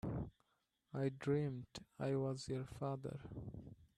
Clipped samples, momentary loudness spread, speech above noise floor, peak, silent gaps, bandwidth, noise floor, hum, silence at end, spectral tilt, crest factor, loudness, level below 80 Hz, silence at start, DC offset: under 0.1%; 13 LU; 42 dB; -26 dBFS; none; 11 kHz; -84 dBFS; none; 0.1 s; -7.5 dB/octave; 18 dB; -44 LUFS; -64 dBFS; 0.05 s; under 0.1%